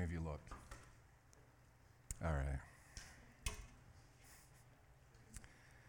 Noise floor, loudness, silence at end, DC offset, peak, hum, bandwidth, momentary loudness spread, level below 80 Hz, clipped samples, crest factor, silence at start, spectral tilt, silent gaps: -68 dBFS; -49 LUFS; 0 s; under 0.1%; -24 dBFS; none; 18 kHz; 24 LU; -56 dBFS; under 0.1%; 26 dB; 0 s; -5 dB/octave; none